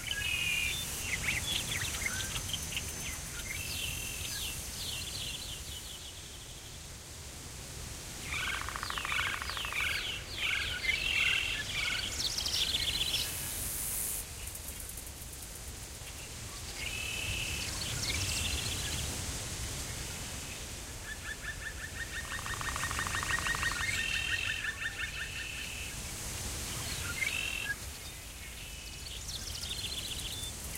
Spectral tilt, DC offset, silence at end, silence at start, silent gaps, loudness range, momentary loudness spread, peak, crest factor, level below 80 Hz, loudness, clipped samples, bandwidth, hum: -1.5 dB/octave; under 0.1%; 0 s; 0 s; none; 8 LU; 12 LU; -18 dBFS; 20 dB; -48 dBFS; -35 LUFS; under 0.1%; 16 kHz; none